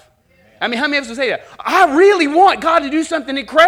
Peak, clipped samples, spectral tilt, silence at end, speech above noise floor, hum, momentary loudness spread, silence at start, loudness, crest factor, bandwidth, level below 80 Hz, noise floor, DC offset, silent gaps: 0 dBFS; under 0.1%; -3 dB/octave; 0 s; 39 dB; none; 10 LU; 0.6 s; -14 LUFS; 14 dB; 16 kHz; -52 dBFS; -52 dBFS; under 0.1%; none